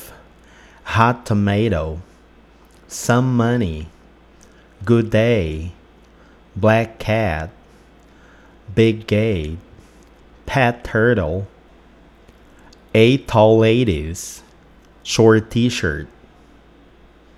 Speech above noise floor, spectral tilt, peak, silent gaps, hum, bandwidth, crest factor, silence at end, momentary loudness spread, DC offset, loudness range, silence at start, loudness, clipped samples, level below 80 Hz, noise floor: 32 dB; -6 dB/octave; 0 dBFS; none; none; 14 kHz; 20 dB; 1.3 s; 20 LU; under 0.1%; 5 LU; 0 s; -17 LUFS; under 0.1%; -40 dBFS; -48 dBFS